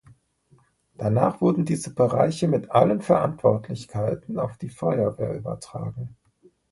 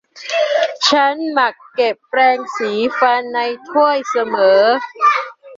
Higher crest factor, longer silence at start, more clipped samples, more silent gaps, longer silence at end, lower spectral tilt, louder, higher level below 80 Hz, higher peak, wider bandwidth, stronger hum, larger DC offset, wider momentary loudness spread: first, 22 dB vs 14 dB; first, 1 s vs 0.15 s; neither; neither; first, 0.6 s vs 0 s; first, -7.5 dB/octave vs -2.5 dB/octave; second, -24 LUFS vs -15 LUFS; first, -56 dBFS vs -66 dBFS; second, -4 dBFS vs 0 dBFS; first, 11.5 kHz vs 7.8 kHz; neither; neither; first, 13 LU vs 7 LU